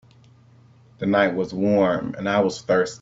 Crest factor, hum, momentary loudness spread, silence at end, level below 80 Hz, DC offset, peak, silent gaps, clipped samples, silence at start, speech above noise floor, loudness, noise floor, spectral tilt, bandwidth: 18 dB; none; 4 LU; 0.05 s; -58 dBFS; under 0.1%; -4 dBFS; none; under 0.1%; 1 s; 31 dB; -22 LUFS; -52 dBFS; -6 dB/octave; 8 kHz